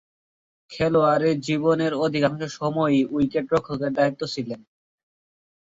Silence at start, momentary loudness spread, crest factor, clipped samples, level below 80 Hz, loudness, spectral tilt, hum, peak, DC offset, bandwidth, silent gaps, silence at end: 0.7 s; 10 LU; 16 dB; under 0.1%; -58 dBFS; -23 LUFS; -6.5 dB/octave; none; -8 dBFS; under 0.1%; 7.8 kHz; none; 1.15 s